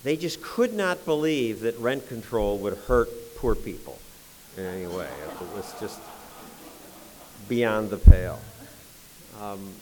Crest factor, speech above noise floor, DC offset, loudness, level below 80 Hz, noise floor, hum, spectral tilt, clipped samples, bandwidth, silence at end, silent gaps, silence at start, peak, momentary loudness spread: 26 dB; 25 dB; under 0.1%; -26 LUFS; -28 dBFS; -48 dBFS; none; -6.5 dB/octave; under 0.1%; 20 kHz; 0 s; none; 0.05 s; 0 dBFS; 22 LU